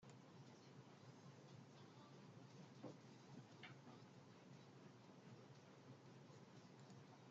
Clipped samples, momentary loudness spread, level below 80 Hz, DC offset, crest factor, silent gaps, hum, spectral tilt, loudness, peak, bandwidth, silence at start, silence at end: under 0.1%; 4 LU; under -90 dBFS; under 0.1%; 20 dB; none; none; -5.5 dB/octave; -64 LUFS; -42 dBFS; 7.6 kHz; 0 s; 0 s